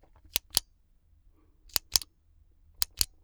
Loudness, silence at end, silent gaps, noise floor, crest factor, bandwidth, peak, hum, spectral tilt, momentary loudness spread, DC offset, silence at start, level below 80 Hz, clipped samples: -30 LUFS; 0.2 s; none; -64 dBFS; 32 dB; over 20 kHz; -4 dBFS; none; 0.5 dB/octave; 6 LU; under 0.1%; 0.35 s; -52 dBFS; under 0.1%